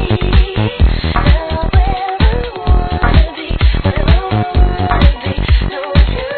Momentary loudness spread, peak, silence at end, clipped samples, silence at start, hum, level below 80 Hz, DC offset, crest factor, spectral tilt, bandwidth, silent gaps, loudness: 3 LU; 0 dBFS; 0 s; 0.2%; 0 s; none; -14 dBFS; 0.3%; 12 dB; -9.5 dB/octave; 4.5 kHz; none; -14 LUFS